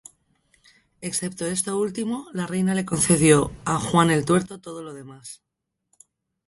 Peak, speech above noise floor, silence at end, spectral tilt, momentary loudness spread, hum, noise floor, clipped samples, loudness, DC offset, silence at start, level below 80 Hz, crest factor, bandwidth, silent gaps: -2 dBFS; 49 dB; 1.15 s; -5 dB/octave; 20 LU; none; -71 dBFS; under 0.1%; -22 LUFS; under 0.1%; 1 s; -52 dBFS; 22 dB; 12 kHz; none